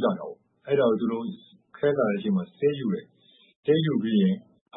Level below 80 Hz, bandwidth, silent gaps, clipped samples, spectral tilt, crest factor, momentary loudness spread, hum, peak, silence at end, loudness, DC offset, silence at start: -72 dBFS; 4 kHz; 3.56-3.63 s, 4.61-4.66 s; under 0.1%; -11.5 dB/octave; 16 dB; 12 LU; none; -10 dBFS; 0 s; -26 LUFS; under 0.1%; 0 s